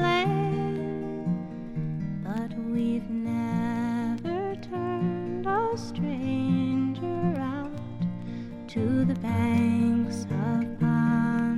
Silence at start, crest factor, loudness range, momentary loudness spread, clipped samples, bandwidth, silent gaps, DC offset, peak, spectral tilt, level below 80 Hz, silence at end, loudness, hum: 0 s; 16 dB; 3 LU; 9 LU; under 0.1%; 11.5 kHz; none; under 0.1%; -12 dBFS; -7.5 dB/octave; -52 dBFS; 0 s; -28 LUFS; none